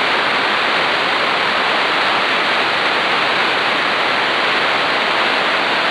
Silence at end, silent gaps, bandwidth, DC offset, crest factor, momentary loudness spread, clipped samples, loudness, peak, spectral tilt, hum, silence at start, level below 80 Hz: 0 s; none; 11 kHz; under 0.1%; 12 dB; 1 LU; under 0.1%; -14 LUFS; -4 dBFS; -2.5 dB/octave; none; 0 s; -58 dBFS